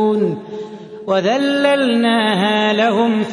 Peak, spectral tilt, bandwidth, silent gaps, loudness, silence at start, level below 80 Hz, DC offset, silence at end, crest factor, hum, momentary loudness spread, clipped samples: -2 dBFS; -5.5 dB/octave; 10.5 kHz; none; -15 LUFS; 0 s; -66 dBFS; under 0.1%; 0 s; 14 dB; none; 15 LU; under 0.1%